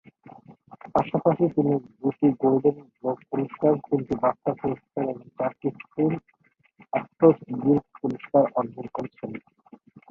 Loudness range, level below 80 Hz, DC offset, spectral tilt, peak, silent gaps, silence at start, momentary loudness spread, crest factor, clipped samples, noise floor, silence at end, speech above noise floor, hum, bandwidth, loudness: 3 LU; -62 dBFS; under 0.1%; -10.5 dB/octave; -4 dBFS; none; 0.5 s; 11 LU; 22 dB; under 0.1%; -61 dBFS; 0.7 s; 36 dB; none; 5 kHz; -25 LUFS